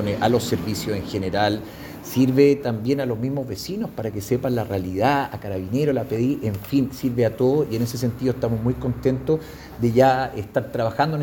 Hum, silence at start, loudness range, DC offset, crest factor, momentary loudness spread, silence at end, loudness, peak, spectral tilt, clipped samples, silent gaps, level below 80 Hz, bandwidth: none; 0 s; 2 LU; under 0.1%; 20 dB; 10 LU; 0 s; -22 LUFS; -2 dBFS; -6.5 dB/octave; under 0.1%; none; -48 dBFS; 20 kHz